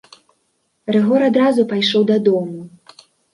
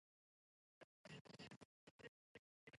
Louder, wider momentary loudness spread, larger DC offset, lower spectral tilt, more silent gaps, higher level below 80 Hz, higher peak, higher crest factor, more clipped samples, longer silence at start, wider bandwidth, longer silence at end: first, -15 LUFS vs -63 LUFS; first, 15 LU vs 7 LU; neither; first, -6.5 dB/octave vs -4.5 dB/octave; second, none vs 0.84-1.04 s, 1.21-1.25 s, 1.56-1.99 s, 2.08-2.67 s; first, -66 dBFS vs -90 dBFS; first, -2 dBFS vs -46 dBFS; second, 14 dB vs 20 dB; neither; about the same, 0.85 s vs 0.8 s; about the same, 11 kHz vs 11 kHz; first, 0.65 s vs 0 s